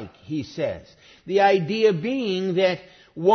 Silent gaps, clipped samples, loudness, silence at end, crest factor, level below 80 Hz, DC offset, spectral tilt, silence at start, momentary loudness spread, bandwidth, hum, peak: none; under 0.1%; -23 LUFS; 0 s; 16 dB; -62 dBFS; under 0.1%; -6.5 dB/octave; 0 s; 13 LU; 6.6 kHz; none; -6 dBFS